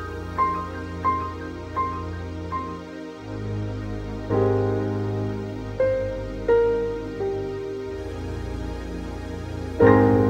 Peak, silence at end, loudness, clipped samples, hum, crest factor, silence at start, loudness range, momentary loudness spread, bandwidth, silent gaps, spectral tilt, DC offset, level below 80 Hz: -4 dBFS; 0 s; -26 LUFS; under 0.1%; none; 20 dB; 0 s; 5 LU; 13 LU; 9.6 kHz; none; -8.5 dB/octave; under 0.1%; -40 dBFS